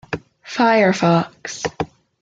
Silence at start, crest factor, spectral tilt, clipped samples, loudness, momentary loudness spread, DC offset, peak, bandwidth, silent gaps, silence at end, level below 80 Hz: 0.1 s; 16 dB; -5.5 dB/octave; under 0.1%; -18 LUFS; 15 LU; under 0.1%; -4 dBFS; 7.8 kHz; none; 0.35 s; -54 dBFS